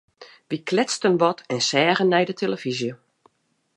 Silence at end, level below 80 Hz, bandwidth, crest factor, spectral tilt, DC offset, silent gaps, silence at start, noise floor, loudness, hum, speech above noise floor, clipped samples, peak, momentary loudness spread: 0.8 s; -72 dBFS; 11.5 kHz; 18 dB; -4 dB/octave; under 0.1%; none; 0.2 s; -67 dBFS; -22 LUFS; none; 45 dB; under 0.1%; -6 dBFS; 11 LU